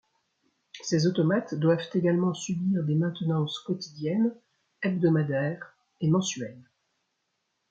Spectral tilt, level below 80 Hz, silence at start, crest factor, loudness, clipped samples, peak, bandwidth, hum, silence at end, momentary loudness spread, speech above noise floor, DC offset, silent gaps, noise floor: -6 dB/octave; -70 dBFS; 0.75 s; 18 dB; -27 LUFS; under 0.1%; -10 dBFS; 7.8 kHz; none; 1.1 s; 9 LU; 52 dB; under 0.1%; none; -78 dBFS